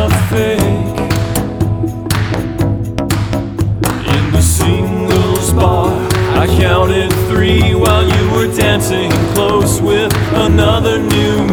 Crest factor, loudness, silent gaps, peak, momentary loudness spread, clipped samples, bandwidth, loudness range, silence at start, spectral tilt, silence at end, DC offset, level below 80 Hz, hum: 12 dB; -13 LUFS; none; 0 dBFS; 6 LU; under 0.1%; over 20 kHz; 4 LU; 0 s; -5.5 dB/octave; 0 s; under 0.1%; -24 dBFS; none